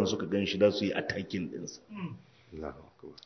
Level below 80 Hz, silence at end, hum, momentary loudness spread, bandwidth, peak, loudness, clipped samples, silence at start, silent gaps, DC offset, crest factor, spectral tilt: -58 dBFS; 0.1 s; none; 23 LU; 6.4 kHz; -12 dBFS; -32 LUFS; under 0.1%; 0 s; none; under 0.1%; 20 dB; -5 dB/octave